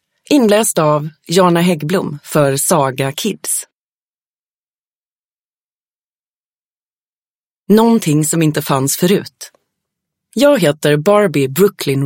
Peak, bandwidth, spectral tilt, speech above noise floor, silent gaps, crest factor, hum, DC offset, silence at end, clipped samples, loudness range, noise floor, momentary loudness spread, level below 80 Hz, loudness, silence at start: 0 dBFS; 17 kHz; -5 dB/octave; over 77 dB; 3.72-7.65 s; 16 dB; none; under 0.1%; 0 s; under 0.1%; 9 LU; under -90 dBFS; 7 LU; -58 dBFS; -13 LUFS; 0.3 s